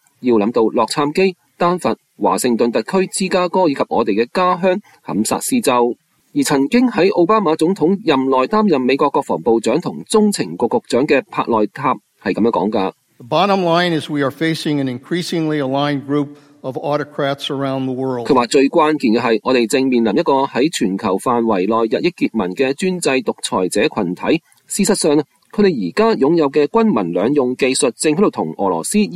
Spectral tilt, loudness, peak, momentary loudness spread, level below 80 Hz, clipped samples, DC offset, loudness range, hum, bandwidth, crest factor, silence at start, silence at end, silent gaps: -5 dB/octave; -16 LUFS; 0 dBFS; 6 LU; -56 dBFS; under 0.1%; under 0.1%; 3 LU; none; 15 kHz; 16 dB; 0.2 s; 0 s; none